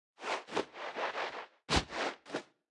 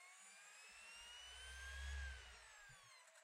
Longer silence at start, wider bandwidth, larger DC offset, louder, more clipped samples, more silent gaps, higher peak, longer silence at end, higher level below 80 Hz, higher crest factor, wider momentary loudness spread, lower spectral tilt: first, 0.2 s vs 0 s; second, 12 kHz vs 15.5 kHz; neither; first, -37 LUFS vs -56 LUFS; neither; neither; first, -14 dBFS vs -40 dBFS; first, 0.25 s vs 0 s; first, -54 dBFS vs -60 dBFS; first, 24 dB vs 16 dB; about the same, 11 LU vs 11 LU; first, -3.5 dB/octave vs -1 dB/octave